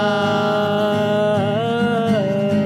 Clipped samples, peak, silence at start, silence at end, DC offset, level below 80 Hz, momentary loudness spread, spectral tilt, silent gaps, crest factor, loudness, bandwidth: under 0.1%; -8 dBFS; 0 s; 0 s; under 0.1%; -56 dBFS; 1 LU; -6.5 dB/octave; none; 10 dB; -18 LUFS; 14 kHz